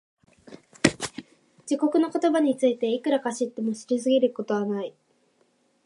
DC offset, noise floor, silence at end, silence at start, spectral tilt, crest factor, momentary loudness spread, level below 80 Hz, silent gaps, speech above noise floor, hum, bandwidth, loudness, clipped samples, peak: under 0.1%; -67 dBFS; 0.95 s; 0.5 s; -4.5 dB/octave; 24 dB; 12 LU; -64 dBFS; none; 42 dB; none; 11.5 kHz; -25 LUFS; under 0.1%; -2 dBFS